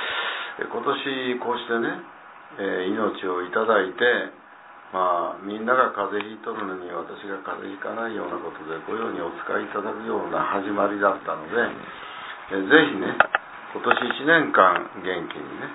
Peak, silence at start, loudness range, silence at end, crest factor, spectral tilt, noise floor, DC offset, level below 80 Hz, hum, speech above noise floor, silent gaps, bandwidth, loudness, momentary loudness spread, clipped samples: 0 dBFS; 0 s; 9 LU; 0 s; 24 dB; -8 dB/octave; -46 dBFS; under 0.1%; -68 dBFS; none; 22 dB; none; 4 kHz; -24 LUFS; 15 LU; under 0.1%